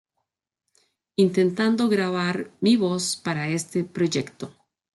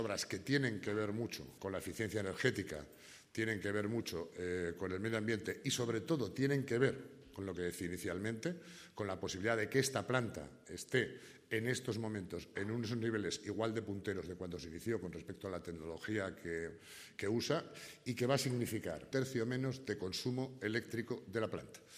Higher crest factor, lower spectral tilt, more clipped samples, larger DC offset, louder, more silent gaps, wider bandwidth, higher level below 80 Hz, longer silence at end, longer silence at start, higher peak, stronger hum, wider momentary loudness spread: second, 16 dB vs 22 dB; about the same, -5 dB/octave vs -5 dB/octave; neither; neither; first, -23 LUFS vs -40 LUFS; neither; second, 12 kHz vs 15.5 kHz; about the same, -68 dBFS vs -68 dBFS; first, 0.45 s vs 0 s; first, 1.2 s vs 0 s; first, -8 dBFS vs -16 dBFS; neither; about the same, 9 LU vs 11 LU